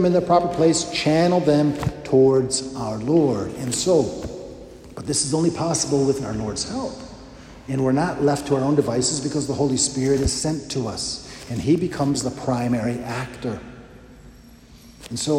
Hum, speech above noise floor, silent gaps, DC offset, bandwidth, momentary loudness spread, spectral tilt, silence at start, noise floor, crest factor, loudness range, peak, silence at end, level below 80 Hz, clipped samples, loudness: none; 25 dB; none; under 0.1%; 15.5 kHz; 15 LU; -5 dB/octave; 0 s; -46 dBFS; 18 dB; 5 LU; -4 dBFS; 0 s; -44 dBFS; under 0.1%; -21 LUFS